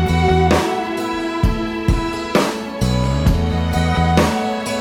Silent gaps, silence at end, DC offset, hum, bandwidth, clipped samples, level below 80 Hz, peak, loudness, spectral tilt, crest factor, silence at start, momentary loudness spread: none; 0 s; under 0.1%; none; 16.5 kHz; under 0.1%; -24 dBFS; 0 dBFS; -18 LUFS; -6 dB/octave; 16 dB; 0 s; 7 LU